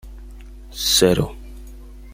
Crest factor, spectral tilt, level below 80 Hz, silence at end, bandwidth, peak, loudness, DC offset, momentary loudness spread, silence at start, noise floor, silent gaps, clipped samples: 22 dB; -3.5 dB/octave; -36 dBFS; 0 s; 16.5 kHz; -2 dBFS; -18 LUFS; under 0.1%; 26 LU; 0.05 s; -38 dBFS; none; under 0.1%